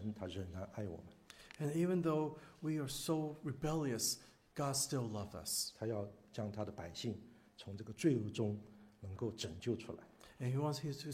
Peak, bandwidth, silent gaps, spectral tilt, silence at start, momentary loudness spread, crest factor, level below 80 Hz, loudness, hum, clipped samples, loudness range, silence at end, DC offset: -22 dBFS; 16 kHz; none; -5 dB/octave; 0 s; 16 LU; 20 dB; -68 dBFS; -41 LUFS; none; under 0.1%; 3 LU; 0 s; under 0.1%